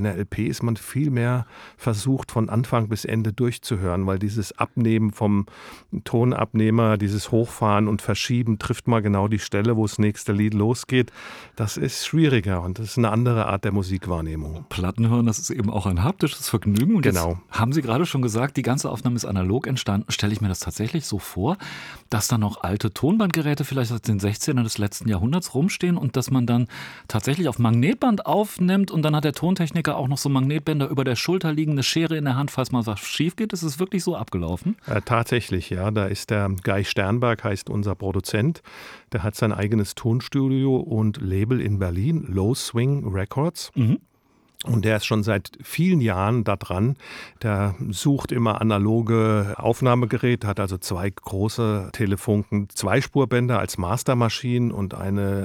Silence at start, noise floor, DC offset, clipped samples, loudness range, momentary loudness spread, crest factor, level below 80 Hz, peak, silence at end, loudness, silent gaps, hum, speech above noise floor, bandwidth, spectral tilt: 0 s; -57 dBFS; under 0.1%; under 0.1%; 3 LU; 7 LU; 20 dB; -50 dBFS; -2 dBFS; 0 s; -23 LUFS; none; none; 35 dB; 17.5 kHz; -6 dB/octave